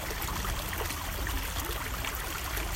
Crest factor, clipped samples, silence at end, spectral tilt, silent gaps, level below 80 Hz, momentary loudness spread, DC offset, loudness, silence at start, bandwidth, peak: 16 dB; under 0.1%; 0 s; -3 dB/octave; none; -38 dBFS; 1 LU; under 0.1%; -34 LUFS; 0 s; 16.5 kHz; -18 dBFS